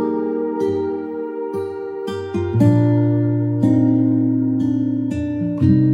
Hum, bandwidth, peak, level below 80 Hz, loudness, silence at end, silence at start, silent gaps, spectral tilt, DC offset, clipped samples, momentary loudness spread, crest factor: none; 7.6 kHz; -2 dBFS; -48 dBFS; -19 LUFS; 0 s; 0 s; none; -10 dB/octave; under 0.1%; under 0.1%; 11 LU; 14 dB